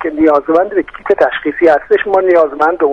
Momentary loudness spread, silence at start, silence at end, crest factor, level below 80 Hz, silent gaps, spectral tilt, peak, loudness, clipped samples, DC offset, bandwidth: 5 LU; 0 s; 0 s; 12 dB; -46 dBFS; none; -6.5 dB/octave; 0 dBFS; -12 LUFS; under 0.1%; under 0.1%; 7.2 kHz